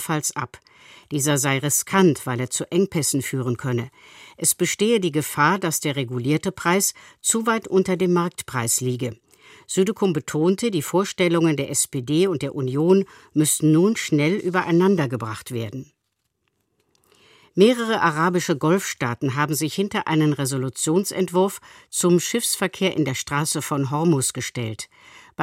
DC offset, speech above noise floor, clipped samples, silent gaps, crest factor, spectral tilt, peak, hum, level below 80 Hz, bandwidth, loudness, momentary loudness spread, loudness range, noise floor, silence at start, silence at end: under 0.1%; 54 dB; under 0.1%; none; 20 dB; -4.5 dB/octave; -2 dBFS; none; -62 dBFS; 16.5 kHz; -21 LUFS; 9 LU; 3 LU; -75 dBFS; 0 s; 0 s